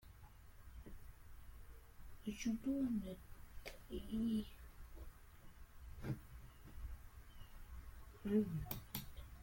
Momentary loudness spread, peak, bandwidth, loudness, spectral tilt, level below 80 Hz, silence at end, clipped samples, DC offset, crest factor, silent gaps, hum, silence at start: 22 LU; -26 dBFS; 17 kHz; -45 LUFS; -6.5 dB/octave; -56 dBFS; 0 s; under 0.1%; under 0.1%; 20 dB; none; none; 0 s